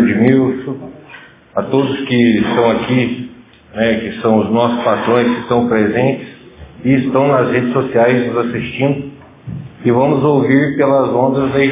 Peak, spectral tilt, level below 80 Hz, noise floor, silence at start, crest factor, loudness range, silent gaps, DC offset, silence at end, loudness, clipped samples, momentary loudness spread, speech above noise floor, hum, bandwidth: 0 dBFS; -11 dB/octave; -46 dBFS; -39 dBFS; 0 s; 14 dB; 1 LU; none; under 0.1%; 0 s; -14 LUFS; under 0.1%; 14 LU; 26 dB; none; 3.8 kHz